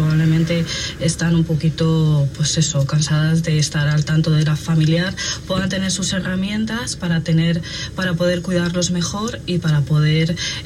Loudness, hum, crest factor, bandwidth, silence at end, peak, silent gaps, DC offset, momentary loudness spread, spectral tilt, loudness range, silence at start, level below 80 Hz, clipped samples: -18 LUFS; none; 12 dB; 12 kHz; 0 s; -6 dBFS; none; under 0.1%; 6 LU; -5 dB/octave; 3 LU; 0 s; -38 dBFS; under 0.1%